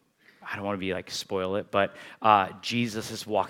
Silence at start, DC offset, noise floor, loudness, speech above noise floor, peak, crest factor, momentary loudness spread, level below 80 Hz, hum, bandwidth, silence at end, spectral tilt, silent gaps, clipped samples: 0.4 s; under 0.1%; -48 dBFS; -28 LUFS; 20 dB; -4 dBFS; 24 dB; 12 LU; -72 dBFS; none; 17 kHz; 0 s; -4.5 dB/octave; none; under 0.1%